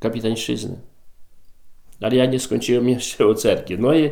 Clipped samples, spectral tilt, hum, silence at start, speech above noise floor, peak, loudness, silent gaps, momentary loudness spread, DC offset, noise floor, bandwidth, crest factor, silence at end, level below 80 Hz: under 0.1%; -5 dB/octave; none; 0 s; 22 dB; -4 dBFS; -20 LUFS; none; 10 LU; under 0.1%; -41 dBFS; 18.5 kHz; 16 dB; 0 s; -48 dBFS